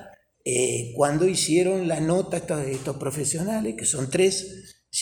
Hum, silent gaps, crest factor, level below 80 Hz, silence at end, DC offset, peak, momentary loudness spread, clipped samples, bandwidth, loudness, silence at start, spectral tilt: none; none; 18 dB; -56 dBFS; 0 s; under 0.1%; -6 dBFS; 9 LU; under 0.1%; 19.5 kHz; -24 LUFS; 0 s; -4 dB/octave